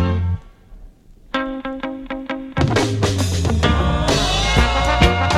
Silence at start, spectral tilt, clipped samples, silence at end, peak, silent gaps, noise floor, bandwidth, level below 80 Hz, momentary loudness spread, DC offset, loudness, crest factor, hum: 0 s; -5 dB/octave; under 0.1%; 0 s; 0 dBFS; none; -43 dBFS; 14 kHz; -26 dBFS; 12 LU; under 0.1%; -19 LUFS; 18 dB; none